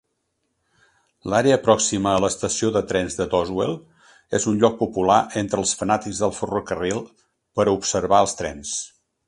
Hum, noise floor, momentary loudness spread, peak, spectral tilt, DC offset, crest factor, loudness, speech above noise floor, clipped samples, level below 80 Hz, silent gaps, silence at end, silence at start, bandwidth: none; -74 dBFS; 10 LU; 0 dBFS; -4 dB/octave; under 0.1%; 22 dB; -21 LUFS; 53 dB; under 0.1%; -50 dBFS; none; 0.4 s; 1.25 s; 11.5 kHz